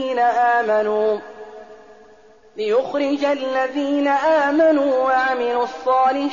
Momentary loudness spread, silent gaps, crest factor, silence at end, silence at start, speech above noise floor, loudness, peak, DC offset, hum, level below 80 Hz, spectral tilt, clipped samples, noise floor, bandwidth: 10 LU; none; 12 dB; 0 s; 0 s; 31 dB; -18 LUFS; -8 dBFS; 0.2%; none; -64 dBFS; -1.5 dB/octave; under 0.1%; -49 dBFS; 7.2 kHz